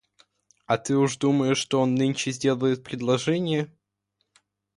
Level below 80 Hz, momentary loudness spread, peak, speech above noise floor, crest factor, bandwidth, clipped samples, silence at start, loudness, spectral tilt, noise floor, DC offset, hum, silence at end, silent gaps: -66 dBFS; 6 LU; -8 dBFS; 53 dB; 18 dB; 11.5 kHz; under 0.1%; 0.7 s; -24 LUFS; -5.5 dB/octave; -77 dBFS; under 0.1%; 50 Hz at -65 dBFS; 1.1 s; none